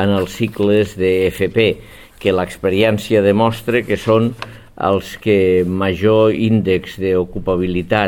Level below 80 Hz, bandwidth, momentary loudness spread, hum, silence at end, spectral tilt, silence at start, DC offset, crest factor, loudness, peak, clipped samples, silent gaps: -42 dBFS; 17.5 kHz; 6 LU; none; 0 s; -6.5 dB/octave; 0 s; under 0.1%; 14 dB; -16 LUFS; 0 dBFS; under 0.1%; none